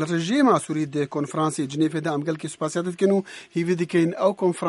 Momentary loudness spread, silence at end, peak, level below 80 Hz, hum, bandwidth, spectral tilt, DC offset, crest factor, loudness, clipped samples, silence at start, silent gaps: 8 LU; 0 s; -6 dBFS; -70 dBFS; none; 11.5 kHz; -6 dB/octave; under 0.1%; 18 dB; -23 LUFS; under 0.1%; 0 s; none